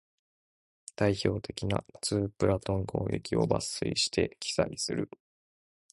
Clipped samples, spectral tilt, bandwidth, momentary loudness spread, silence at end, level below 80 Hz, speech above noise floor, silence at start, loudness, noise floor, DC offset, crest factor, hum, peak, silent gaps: under 0.1%; -5 dB/octave; 11.5 kHz; 6 LU; 0.85 s; -52 dBFS; over 60 dB; 1 s; -31 LUFS; under -90 dBFS; under 0.1%; 22 dB; none; -10 dBFS; none